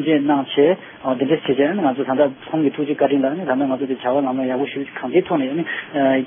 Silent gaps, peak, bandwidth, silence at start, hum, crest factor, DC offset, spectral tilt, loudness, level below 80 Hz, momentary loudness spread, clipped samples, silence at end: none; -4 dBFS; 3.7 kHz; 0 s; none; 16 dB; under 0.1%; -11 dB/octave; -19 LUFS; -66 dBFS; 6 LU; under 0.1%; 0 s